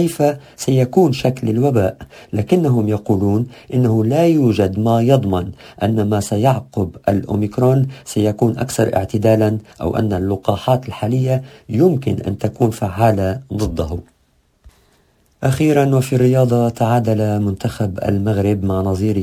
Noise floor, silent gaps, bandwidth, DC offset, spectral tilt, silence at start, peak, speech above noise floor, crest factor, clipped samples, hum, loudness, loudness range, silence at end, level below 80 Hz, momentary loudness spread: -59 dBFS; none; 16 kHz; under 0.1%; -7.5 dB/octave; 0 s; 0 dBFS; 43 dB; 16 dB; under 0.1%; none; -17 LUFS; 3 LU; 0 s; -38 dBFS; 8 LU